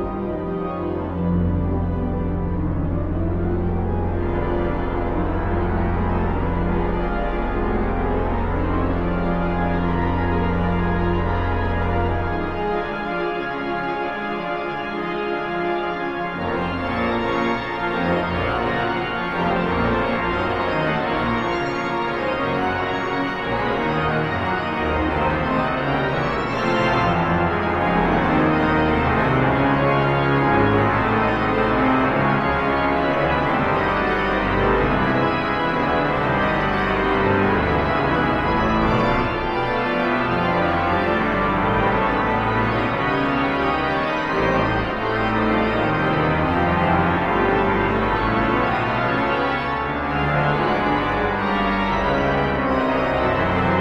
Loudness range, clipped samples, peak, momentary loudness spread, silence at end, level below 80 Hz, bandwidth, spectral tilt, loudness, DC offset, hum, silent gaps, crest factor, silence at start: 5 LU; under 0.1%; -4 dBFS; 6 LU; 0 s; -32 dBFS; 7.8 kHz; -8 dB/octave; -21 LUFS; under 0.1%; none; none; 16 dB; 0 s